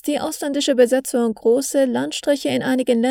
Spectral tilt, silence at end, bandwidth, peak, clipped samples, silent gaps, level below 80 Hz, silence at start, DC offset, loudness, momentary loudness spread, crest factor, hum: -3.5 dB/octave; 0 s; 17 kHz; -4 dBFS; under 0.1%; none; -62 dBFS; 0.05 s; under 0.1%; -19 LUFS; 6 LU; 16 dB; none